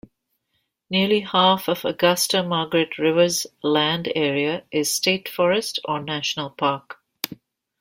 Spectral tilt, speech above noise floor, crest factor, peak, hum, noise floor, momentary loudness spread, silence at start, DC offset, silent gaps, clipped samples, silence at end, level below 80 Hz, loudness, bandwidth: -3.5 dB/octave; 52 dB; 22 dB; 0 dBFS; none; -74 dBFS; 8 LU; 0.9 s; under 0.1%; none; under 0.1%; 0.45 s; -64 dBFS; -21 LUFS; 16.5 kHz